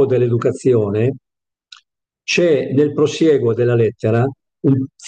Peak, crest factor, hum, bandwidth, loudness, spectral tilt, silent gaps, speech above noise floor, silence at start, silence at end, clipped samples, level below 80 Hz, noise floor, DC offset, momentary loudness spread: -4 dBFS; 12 dB; none; 8.8 kHz; -16 LUFS; -7 dB/octave; none; 45 dB; 0 s; 0 s; under 0.1%; -62 dBFS; -60 dBFS; under 0.1%; 6 LU